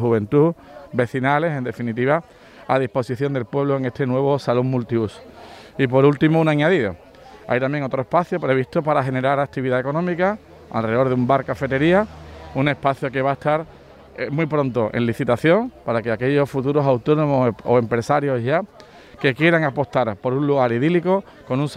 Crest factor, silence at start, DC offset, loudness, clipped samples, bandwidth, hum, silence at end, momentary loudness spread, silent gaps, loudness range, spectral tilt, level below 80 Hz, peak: 16 dB; 0 s; under 0.1%; -20 LUFS; under 0.1%; 12 kHz; none; 0 s; 9 LU; none; 3 LU; -8 dB/octave; -54 dBFS; -4 dBFS